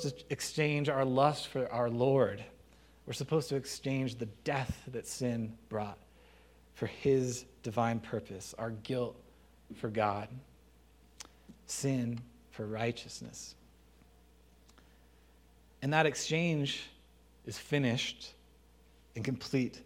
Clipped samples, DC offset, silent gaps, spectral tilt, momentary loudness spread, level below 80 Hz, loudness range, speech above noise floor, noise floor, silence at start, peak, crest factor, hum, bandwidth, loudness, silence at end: under 0.1%; under 0.1%; none; -5 dB/octave; 18 LU; -62 dBFS; 7 LU; 28 dB; -62 dBFS; 0 s; -10 dBFS; 26 dB; none; 16 kHz; -35 LUFS; 0 s